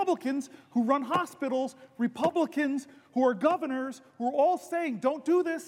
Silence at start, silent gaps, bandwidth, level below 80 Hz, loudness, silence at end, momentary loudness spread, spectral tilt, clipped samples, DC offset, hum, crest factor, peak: 0 s; none; 16 kHz; -82 dBFS; -29 LUFS; 0 s; 8 LU; -5.5 dB/octave; under 0.1%; under 0.1%; none; 18 dB; -10 dBFS